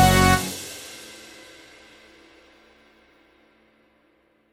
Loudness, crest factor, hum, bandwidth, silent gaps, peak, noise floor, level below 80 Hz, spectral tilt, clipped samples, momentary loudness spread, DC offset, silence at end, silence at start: -21 LUFS; 22 dB; none; 17.5 kHz; none; -2 dBFS; -63 dBFS; -38 dBFS; -4 dB/octave; under 0.1%; 30 LU; under 0.1%; 3.55 s; 0 s